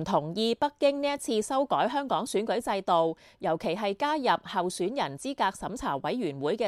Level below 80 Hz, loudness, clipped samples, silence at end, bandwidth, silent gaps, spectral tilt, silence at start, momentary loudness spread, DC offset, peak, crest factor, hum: -60 dBFS; -29 LUFS; under 0.1%; 0 s; 14 kHz; none; -4.5 dB/octave; 0 s; 5 LU; under 0.1%; -12 dBFS; 16 dB; none